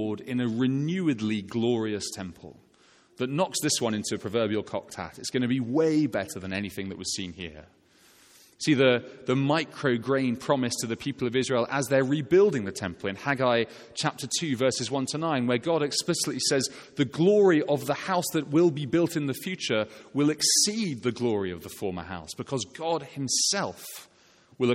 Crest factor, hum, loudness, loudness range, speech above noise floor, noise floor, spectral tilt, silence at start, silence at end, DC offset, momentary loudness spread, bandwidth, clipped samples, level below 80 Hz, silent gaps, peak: 20 dB; none; -27 LUFS; 5 LU; 33 dB; -60 dBFS; -4 dB/octave; 0 s; 0 s; under 0.1%; 12 LU; 16 kHz; under 0.1%; -64 dBFS; none; -8 dBFS